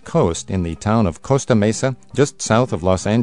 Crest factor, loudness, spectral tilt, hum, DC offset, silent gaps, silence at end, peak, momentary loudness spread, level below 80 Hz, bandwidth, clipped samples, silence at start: 16 dB; -18 LUFS; -6 dB/octave; none; 0.7%; none; 0 s; -2 dBFS; 6 LU; -44 dBFS; 11 kHz; under 0.1%; 0.05 s